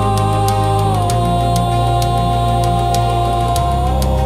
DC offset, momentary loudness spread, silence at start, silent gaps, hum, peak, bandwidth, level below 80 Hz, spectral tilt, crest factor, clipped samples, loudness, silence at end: under 0.1%; 1 LU; 0 s; none; none; -2 dBFS; 15.5 kHz; -22 dBFS; -6 dB/octave; 12 dB; under 0.1%; -15 LUFS; 0 s